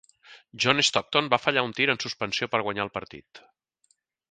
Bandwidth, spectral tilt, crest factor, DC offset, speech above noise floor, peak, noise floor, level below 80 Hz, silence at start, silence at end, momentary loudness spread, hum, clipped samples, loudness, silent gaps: 9.6 kHz; -3 dB/octave; 26 dB; under 0.1%; 44 dB; -2 dBFS; -70 dBFS; -64 dBFS; 0.3 s; 0.95 s; 12 LU; none; under 0.1%; -24 LUFS; none